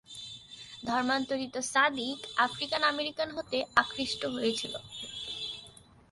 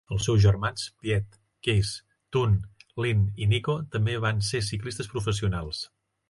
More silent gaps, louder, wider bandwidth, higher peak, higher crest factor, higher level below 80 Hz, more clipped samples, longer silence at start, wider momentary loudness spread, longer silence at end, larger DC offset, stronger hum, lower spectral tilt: neither; second, -31 LUFS vs -27 LUFS; about the same, 11.5 kHz vs 11.5 kHz; about the same, -8 dBFS vs -10 dBFS; first, 24 dB vs 16 dB; second, -66 dBFS vs -42 dBFS; neither; about the same, 0.1 s vs 0.1 s; first, 14 LU vs 11 LU; about the same, 0.4 s vs 0.45 s; neither; neither; second, -2 dB/octave vs -5.5 dB/octave